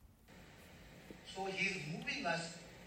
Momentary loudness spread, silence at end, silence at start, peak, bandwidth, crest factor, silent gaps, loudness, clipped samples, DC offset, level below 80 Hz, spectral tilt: 21 LU; 0 s; 0 s; -24 dBFS; 16 kHz; 20 dB; none; -40 LUFS; under 0.1%; under 0.1%; -68 dBFS; -3.5 dB/octave